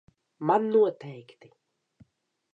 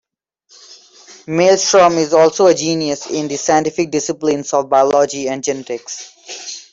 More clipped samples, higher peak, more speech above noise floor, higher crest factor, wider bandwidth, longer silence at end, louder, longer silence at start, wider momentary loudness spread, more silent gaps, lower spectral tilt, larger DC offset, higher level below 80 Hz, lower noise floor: neither; second, -10 dBFS vs -2 dBFS; about the same, 40 dB vs 43 dB; about the same, 18 dB vs 14 dB; second, 4.8 kHz vs 7.8 kHz; first, 1.35 s vs 0.1 s; second, -25 LUFS vs -15 LUFS; second, 0.4 s vs 0.7 s; first, 21 LU vs 16 LU; neither; first, -8.5 dB/octave vs -3.5 dB/octave; neither; second, -78 dBFS vs -58 dBFS; first, -66 dBFS vs -57 dBFS